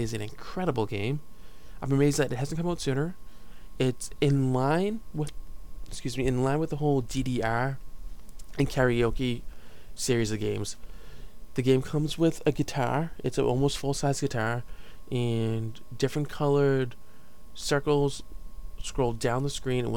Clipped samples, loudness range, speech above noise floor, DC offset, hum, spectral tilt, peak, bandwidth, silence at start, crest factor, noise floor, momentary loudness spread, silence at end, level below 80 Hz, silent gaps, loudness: under 0.1%; 2 LU; 23 dB; 1%; none; -6 dB/octave; -10 dBFS; 17.5 kHz; 0 s; 18 dB; -51 dBFS; 13 LU; 0 s; -42 dBFS; none; -28 LUFS